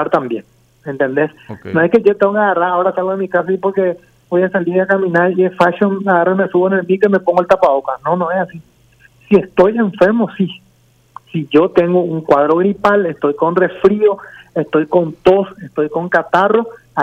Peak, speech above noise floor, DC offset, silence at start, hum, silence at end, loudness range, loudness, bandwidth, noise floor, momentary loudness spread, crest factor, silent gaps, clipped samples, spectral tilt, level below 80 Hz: 0 dBFS; 39 dB; under 0.1%; 0 s; none; 0 s; 2 LU; -14 LUFS; 8 kHz; -52 dBFS; 9 LU; 14 dB; none; under 0.1%; -8 dB/octave; -52 dBFS